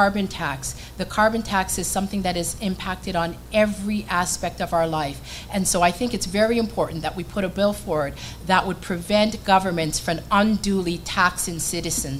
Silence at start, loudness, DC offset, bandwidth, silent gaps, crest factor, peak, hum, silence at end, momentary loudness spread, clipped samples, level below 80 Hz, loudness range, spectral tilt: 0 s; -23 LUFS; under 0.1%; 16.5 kHz; none; 20 dB; -2 dBFS; none; 0 s; 8 LU; under 0.1%; -40 dBFS; 3 LU; -4 dB/octave